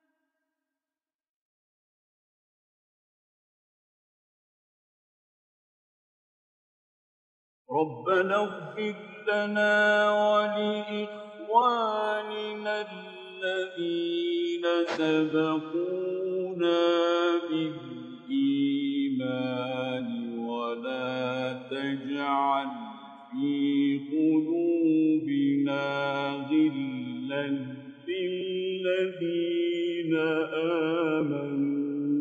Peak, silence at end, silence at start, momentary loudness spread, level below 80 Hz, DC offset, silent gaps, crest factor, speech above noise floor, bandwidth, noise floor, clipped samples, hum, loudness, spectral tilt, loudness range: -10 dBFS; 0 s; 7.7 s; 10 LU; -84 dBFS; under 0.1%; none; 20 dB; over 63 dB; 8.2 kHz; under -90 dBFS; under 0.1%; none; -28 LUFS; -6.5 dB/octave; 5 LU